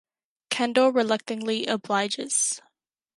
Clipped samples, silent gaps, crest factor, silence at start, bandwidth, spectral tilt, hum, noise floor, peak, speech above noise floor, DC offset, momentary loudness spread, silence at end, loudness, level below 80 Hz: under 0.1%; none; 18 dB; 0.5 s; 11.5 kHz; -2 dB/octave; none; -73 dBFS; -8 dBFS; 49 dB; under 0.1%; 7 LU; 0.55 s; -25 LUFS; -78 dBFS